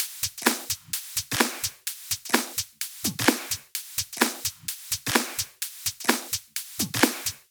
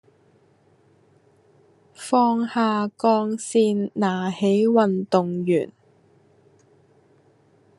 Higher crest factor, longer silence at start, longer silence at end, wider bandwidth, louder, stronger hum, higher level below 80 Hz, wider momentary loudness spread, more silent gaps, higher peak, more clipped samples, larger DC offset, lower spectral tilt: first, 26 dB vs 20 dB; second, 0 s vs 2 s; second, 0.1 s vs 2.1 s; first, over 20 kHz vs 11.5 kHz; second, -27 LUFS vs -21 LUFS; neither; first, -60 dBFS vs -74 dBFS; about the same, 7 LU vs 5 LU; neither; about the same, -4 dBFS vs -4 dBFS; neither; neither; second, -1.5 dB/octave vs -6 dB/octave